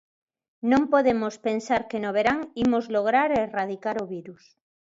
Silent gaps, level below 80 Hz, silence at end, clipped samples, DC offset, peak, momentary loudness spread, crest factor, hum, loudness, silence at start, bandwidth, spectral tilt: none; -58 dBFS; 0.5 s; under 0.1%; under 0.1%; -8 dBFS; 9 LU; 18 dB; none; -24 LUFS; 0.65 s; 7.8 kHz; -5.5 dB/octave